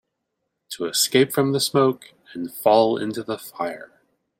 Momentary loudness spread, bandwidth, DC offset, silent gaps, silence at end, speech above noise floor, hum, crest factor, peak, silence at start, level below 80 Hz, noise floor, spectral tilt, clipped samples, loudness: 18 LU; 16.5 kHz; under 0.1%; none; 0.55 s; 57 dB; none; 20 dB; -2 dBFS; 0.7 s; -68 dBFS; -78 dBFS; -4 dB/octave; under 0.1%; -21 LUFS